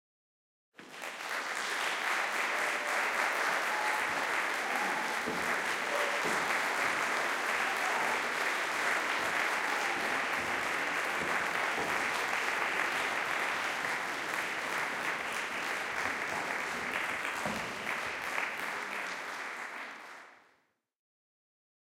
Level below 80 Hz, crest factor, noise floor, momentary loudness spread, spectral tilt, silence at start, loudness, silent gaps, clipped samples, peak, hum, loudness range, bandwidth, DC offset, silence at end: -72 dBFS; 18 dB; -74 dBFS; 6 LU; -1.5 dB/octave; 0.8 s; -32 LUFS; none; under 0.1%; -16 dBFS; none; 5 LU; 17 kHz; under 0.1%; 1.65 s